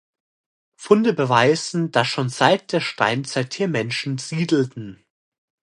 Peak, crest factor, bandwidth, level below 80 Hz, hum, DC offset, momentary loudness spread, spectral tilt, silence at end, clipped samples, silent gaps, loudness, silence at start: -2 dBFS; 20 dB; 11 kHz; -66 dBFS; none; under 0.1%; 9 LU; -5 dB/octave; 0.7 s; under 0.1%; none; -20 LUFS; 0.8 s